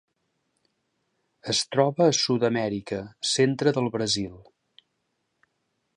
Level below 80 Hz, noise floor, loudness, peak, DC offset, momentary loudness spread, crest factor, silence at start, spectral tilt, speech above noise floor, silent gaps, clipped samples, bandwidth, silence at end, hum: -62 dBFS; -76 dBFS; -24 LUFS; -6 dBFS; under 0.1%; 11 LU; 22 dB; 1.45 s; -4 dB/octave; 52 dB; none; under 0.1%; 11 kHz; 1.55 s; none